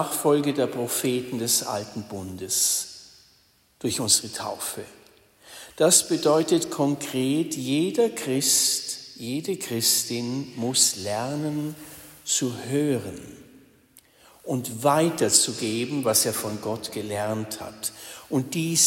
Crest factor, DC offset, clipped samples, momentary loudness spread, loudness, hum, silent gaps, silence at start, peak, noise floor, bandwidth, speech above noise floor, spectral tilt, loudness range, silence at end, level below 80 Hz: 22 dB; under 0.1%; under 0.1%; 16 LU; -24 LUFS; none; none; 0 s; -4 dBFS; -61 dBFS; 16.5 kHz; 37 dB; -3 dB/octave; 4 LU; 0 s; -66 dBFS